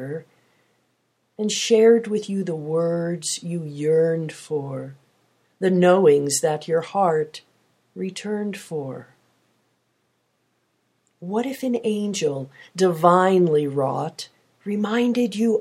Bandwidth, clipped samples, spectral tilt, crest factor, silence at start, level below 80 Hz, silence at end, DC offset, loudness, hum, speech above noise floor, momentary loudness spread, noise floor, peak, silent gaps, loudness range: 15.5 kHz; under 0.1%; -5 dB/octave; 20 dB; 0 s; -74 dBFS; 0 s; under 0.1%; -21 LUFS; none; 49 dB; 17 LU; -70 dBFS; -2 dBFS; none; 12 LU